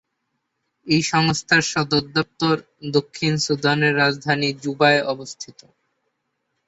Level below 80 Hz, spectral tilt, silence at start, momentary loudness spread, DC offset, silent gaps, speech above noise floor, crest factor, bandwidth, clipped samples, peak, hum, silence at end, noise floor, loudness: -58 dBFS; -4.5 dB/octave; 0.85 s; 9 LU; under 0.1%; none; 55 dB; 20 dB; 8 kHz; under 0.1%; -2 dBFS; none; 1.15 s; -75 dBFS; -20 LUFS